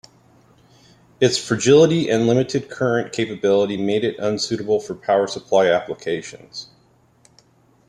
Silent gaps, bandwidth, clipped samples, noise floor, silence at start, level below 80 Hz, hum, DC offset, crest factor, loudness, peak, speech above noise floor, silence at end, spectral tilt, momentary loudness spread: none; 11.5 kHz; under 0.1%; -57 dBFS; 1.2 s; -60 dBFS; none; under 0.1%; 18 dB; -19 LUFS; -2 dBFS; 38 dB; 1.25 s; -5 dB/octave; 12 LU